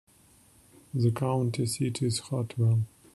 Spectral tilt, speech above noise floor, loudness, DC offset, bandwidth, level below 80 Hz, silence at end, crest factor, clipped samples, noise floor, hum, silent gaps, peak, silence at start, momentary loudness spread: -6 dB/octave; 32 dB; -29 LUFS; under 0.1%; 12.5 kHz; -64 dBFS; 0.25 s; 16 dB; under 0.1%; -60 dBFS; none; none; -14 dBFS; 0.95 s; 4 LU